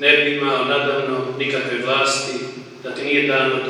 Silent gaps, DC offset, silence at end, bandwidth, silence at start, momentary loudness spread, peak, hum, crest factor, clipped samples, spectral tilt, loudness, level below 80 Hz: none; under 0.1%; 0 s; 12 kHz; 0 s; 13 LU; -2 dBFS; none; 18 dB; under 0.1%; -3 dB/octave; -19 LUFS; -78 dBFS